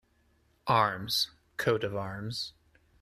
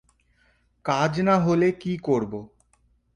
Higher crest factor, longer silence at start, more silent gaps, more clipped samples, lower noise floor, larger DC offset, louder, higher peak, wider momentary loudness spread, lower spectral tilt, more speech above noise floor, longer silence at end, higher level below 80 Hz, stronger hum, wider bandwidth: about the same, 22 dB vs 18 dB; second, 0.65 s vs 0.85 s; neither; neither; first, -69 dBFS vs -65 dBFS; neither; second, -31 LUFS vs -23 LUFS; about the same, -10 dBFS vs -8 dBFS; second, 11 LU vs 14 LU; second, -4 dB/octave vs -7 dB/octave; about the same, 39 dB vs 42 dB; second, 0.5 s vs 0.7 s; second, -64 dBFS vs -56 dBFS; second, none vs 60 Hz at -55 dBFS; first, 14 kHz vs 10.5 kHz